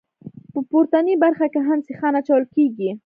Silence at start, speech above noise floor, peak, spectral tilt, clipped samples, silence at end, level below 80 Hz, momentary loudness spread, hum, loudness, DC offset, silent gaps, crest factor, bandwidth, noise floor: 0.25 s; 23 dB; -4 dBFS; -9.5 dB/octave; under 0.1%; 0.05 s; -72 dBFS; 5 LU; none; -19 LUFS; under 0.1%; none; 16 dB; 4.7 kHz; -41 dBFS